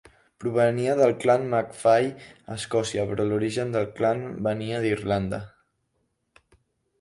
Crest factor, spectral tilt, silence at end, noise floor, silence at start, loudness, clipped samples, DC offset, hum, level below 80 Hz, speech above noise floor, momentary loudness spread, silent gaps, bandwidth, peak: 18 dB; -6 dB/octave; 1.5 s; -74 dBFS; 0.4 s; -25 LUFS; under 0.1%; under 0.1%; none; -56 dBFS; 50 dB; 11 LU; none; 11.5 kHz; -8 dBFS